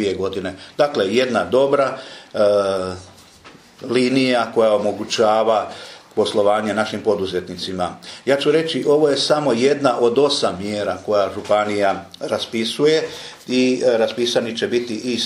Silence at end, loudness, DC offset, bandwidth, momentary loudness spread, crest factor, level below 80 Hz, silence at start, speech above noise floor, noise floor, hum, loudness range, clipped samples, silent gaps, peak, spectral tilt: 0 s; -19 LUFS; under 0.1%; 14.5 kHz; 11 LU; 18 dB; -62 dBFS; 0 s; 27 dB; -45 dBFS; none; 2 LU; under 0.1%; none; -2 dBFS; -4.5 dB/octave